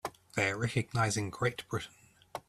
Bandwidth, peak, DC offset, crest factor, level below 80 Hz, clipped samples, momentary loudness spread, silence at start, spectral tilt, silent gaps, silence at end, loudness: 14 kHz; -16 dBFS; under 0.1%; 20 dB; -62 dBFS; under 0.1%; 9 LU; 0.05 s; -4.5 dB/octave; none; 0.1 s; -33 LUFS